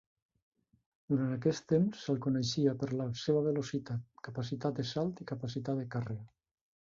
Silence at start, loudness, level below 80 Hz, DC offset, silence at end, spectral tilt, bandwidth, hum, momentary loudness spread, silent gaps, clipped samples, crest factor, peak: 1.1 s; -35 LUFS; -68 dBFS; under 0.1%; 0.55 s; -6.5 dB/octave; 7.6 kHz; none; 10 LU; none; under 0.1%; 18 dB; -16 dBFS